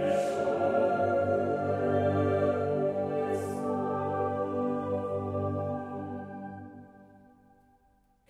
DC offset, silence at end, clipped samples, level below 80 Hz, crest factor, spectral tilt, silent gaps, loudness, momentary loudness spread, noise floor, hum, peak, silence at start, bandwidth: under 0.1%; 1.15 s; under 0.1%; -68 dBFS; 14 dB; -8 dB/octave; none; -30 LUFS; 12 LU; -67 dBFS; 50 Hz at -55 dBFS; -16 dBFS; 0 s; 13 kHz